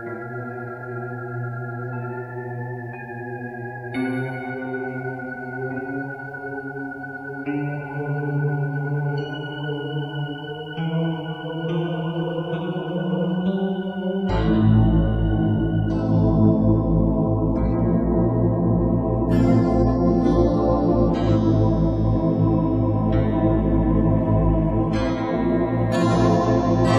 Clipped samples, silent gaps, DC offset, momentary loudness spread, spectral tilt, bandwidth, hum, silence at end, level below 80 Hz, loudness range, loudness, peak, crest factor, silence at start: under 0.1%; none; under 0.1%; 13 LU; -9 dB/octave; 8.2 kHz; none; 0 s; -32 dBFS; 10 LU; -22 LUFS; -6 dBFS; 16 dB; 0 s